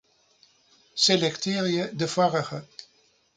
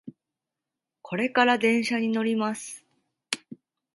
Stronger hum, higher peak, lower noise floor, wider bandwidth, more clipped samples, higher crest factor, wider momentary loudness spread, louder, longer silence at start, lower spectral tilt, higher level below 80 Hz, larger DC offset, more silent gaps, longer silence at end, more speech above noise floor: neither; about the same, -8 dBFS vs -6 dBFS; second, -64 dBFS vs -87 dBFS; second, 9.6 kHz vs 11.5 kHz; neither; about the same, 20 dB vs 22 dB; first, 18 LU vs 15 LU; about the same, -24 LUFS vs -25 LUFS; first, 0.95 s vs 0.05 s; about the same, -4 dB/octave vs -4 dB/octave; first, -70 dBFS vs -78 dBFS; neither; neither; first, 0.55 s vs 0.4 s; second, 39 dB vs 63 dB